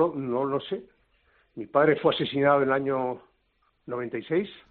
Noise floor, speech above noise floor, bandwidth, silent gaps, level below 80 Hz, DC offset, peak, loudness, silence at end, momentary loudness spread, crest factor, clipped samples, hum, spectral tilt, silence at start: -70 dBFS; 45 dB; 4.6 kHz; none; -66 dBFS; under 0.1%; -10 dBFS; -26 LUFS; 0.15 s; 15 LU; 18 dB; under 0.1%; none; -4 dB/octave; 0 s